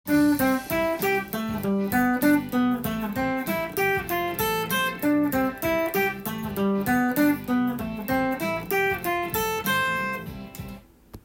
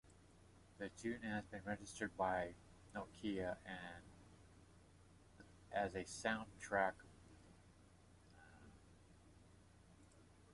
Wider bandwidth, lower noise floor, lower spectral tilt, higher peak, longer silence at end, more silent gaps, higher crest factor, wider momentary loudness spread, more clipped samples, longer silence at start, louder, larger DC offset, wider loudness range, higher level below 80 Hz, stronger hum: first, 17 kHz vs 11.5 kHz; second, -46 dBFS vs -67 dBFS; about the same, -5 dB/octave vs -4.5 dB/octave; first, -10 dBFS vs -24 dBFS; about the same, 0.05 s vs 0 s; neither; second, 16 dB vs 24 dB; second, 7 LU vs 26 LU; neither; about the same, 0.05 s vs 0.05 s; first, -25 LUFS vs -46 LUFS; neither; second, 1 LU vs 6 LU; first, -50 dBFS vs -68 dBFS; neither